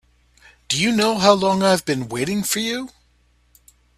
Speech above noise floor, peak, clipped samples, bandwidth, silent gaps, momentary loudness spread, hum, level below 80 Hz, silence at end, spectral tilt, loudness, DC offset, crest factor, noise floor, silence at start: 41 dB; 0 dBFS; under 0.1%; 16 kHz; none; 9 LU; none; -54 dBFS; 1.1 s; -4 dB/octave; -19 LUFS; under 0.1%; 22 dB; -59 dBFS; 0.7 s